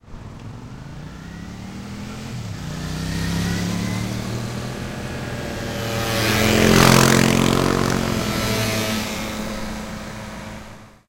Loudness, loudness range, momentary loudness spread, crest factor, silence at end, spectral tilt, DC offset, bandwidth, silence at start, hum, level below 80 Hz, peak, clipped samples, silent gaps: -20 LUFS; 11 LU; 21 LU; 22 dB; 0.2 s; -4.5 dB/octave; under 0.1%; 17 kHz; 0.05 s; none; -36 dBFS; 0 dBFS; under 0.1%; none